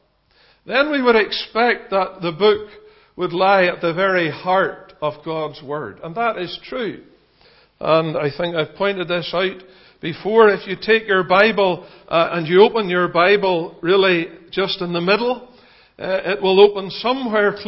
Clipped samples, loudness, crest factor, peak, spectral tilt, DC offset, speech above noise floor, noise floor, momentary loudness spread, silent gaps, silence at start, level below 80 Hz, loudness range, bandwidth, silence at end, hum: under 0.1%; -18 LUFS; 18 dB; 0 dBFS; -8.5 dB/octave; under 0.1%; 39 dB; -57 dBFS; 13 LU; none; 0.65 s; -58 dBFS; 7 LU; 5.8 kHz; 0 s; none